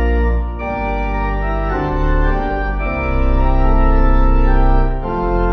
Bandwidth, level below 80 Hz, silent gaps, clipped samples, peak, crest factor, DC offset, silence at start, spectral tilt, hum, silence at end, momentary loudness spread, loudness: 4.9 kHz; -16 dBFS; none; under 0.1%; -2 dBFS; 12 dB; under 0.1%; 0 s; -9.5 dB/octave; none; 0 s; 5 LU; -18 LUFS